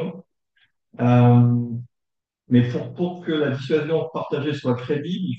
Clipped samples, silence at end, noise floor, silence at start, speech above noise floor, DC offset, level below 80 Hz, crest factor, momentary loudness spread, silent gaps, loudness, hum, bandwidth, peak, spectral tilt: under 0.1%; 0 s; -83 dBFS; 0 s; 63 dB; under 0.1%; -64 dBFS; 18 dB; 12 LU; none; -21 LUFS; none; 6.2 kHz; -4 dBFS; -9 dB/octave